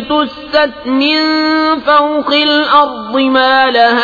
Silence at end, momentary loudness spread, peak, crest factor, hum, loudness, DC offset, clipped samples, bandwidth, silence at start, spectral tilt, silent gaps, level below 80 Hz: 0 s; 6 LU; 0 dBFS; 10 dB; none; -10 LUFS; under 0.1%; under 0.1%; 5 kHz; 0 s; -4 dB/octave; none; -48 dBFS